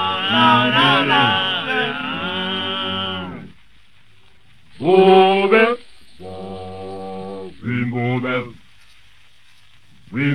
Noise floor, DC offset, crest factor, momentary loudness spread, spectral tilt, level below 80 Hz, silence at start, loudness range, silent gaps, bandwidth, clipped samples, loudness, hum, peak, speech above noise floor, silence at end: -54 dBFS; 0.6%; 20 dB; 19 LU; -6 dB/octave; -56 dBFS; 0 s; 10 LU; none; 11 kHz; under 0.1%; -16 LUFS; none; 0 dBFS; 40 dB; 0 s